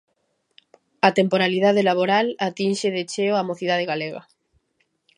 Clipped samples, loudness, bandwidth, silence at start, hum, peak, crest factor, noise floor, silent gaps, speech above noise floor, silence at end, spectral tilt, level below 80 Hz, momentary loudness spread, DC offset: under 0.1%; -21 LUFS; 11.5 kHz; 1.05 s; none; 0 dBFS; 22 dB; -71 dBFS; none; 50 dB; 1 s; -5 dB/octave; -74 dBFS; 8 LU; under 0.1%